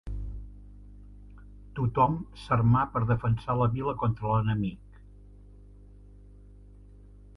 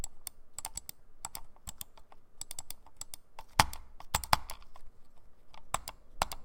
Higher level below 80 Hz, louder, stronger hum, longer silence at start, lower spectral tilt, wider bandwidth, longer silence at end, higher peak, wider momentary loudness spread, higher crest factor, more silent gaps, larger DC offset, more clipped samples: about the same, -46 dBFS vs -50 dBFS; first, -28 LUFS vs -37 LUFS; first, 50 Hz at -45 dBFS vs none; about the same, 0.05 s vs 0 s; first, -9.5 dB/octave vs -2 dB/octave; second, 5.6 kHz vs 17 kHz; first, 2.6 s vs 0 s; second, -12 dBFS vs -2 dBFS; about the same, 18 LU vs 19 LU; second, 18 dB vs 36 dB; neither; neither; neither